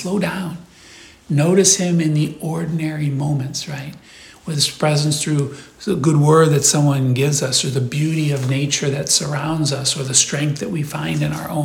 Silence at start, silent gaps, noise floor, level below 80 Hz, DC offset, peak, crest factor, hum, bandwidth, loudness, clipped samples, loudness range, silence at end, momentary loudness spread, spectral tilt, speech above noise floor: 0 s; none; -43 dBFS; -52 dBFS; under 0.1%; 0 dBFS; 18 dB; none; 16.5 kHz; -17 LUFS; under 0.1%; 5 LU; 0 s; 12 LU; -4.5 dB/octave; 25 dB